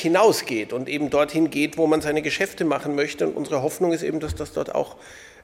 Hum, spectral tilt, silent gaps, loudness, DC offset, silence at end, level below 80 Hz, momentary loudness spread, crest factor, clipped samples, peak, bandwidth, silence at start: none; -4.5 dB/octave; none; -23 LUFS; under 0.1%; 0.15 s; -50 dBFS; 9 LU; 18 dB; under 0.1%; -4 dBFS; 16.5 kHz; 0 s